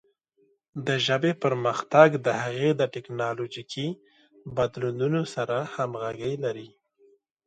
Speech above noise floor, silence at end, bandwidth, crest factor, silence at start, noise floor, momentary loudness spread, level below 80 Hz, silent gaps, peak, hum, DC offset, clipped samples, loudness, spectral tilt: 42 dB; 0.8 s; 9.2 kHz; 24 dB; 0.75 s; -67 dBFS; 14 LU; -66 dBFS; none; -2 dBFS; none; under 0.1%; under 0.1%; -26 LUFS; -6 dB/octave